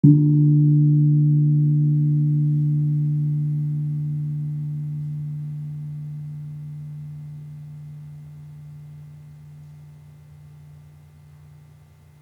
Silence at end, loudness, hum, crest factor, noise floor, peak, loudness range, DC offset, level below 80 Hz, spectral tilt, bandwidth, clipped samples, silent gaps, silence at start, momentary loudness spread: 1.45 s; -21 LUFS; none; 20 dB; -49 dBFS; -2 dBFS; 24 LU; under 0.1%; -64 dBFS; -12.5 dB/octave; 1 kHz; under 0.1%; none; 0.05 s; 24 LU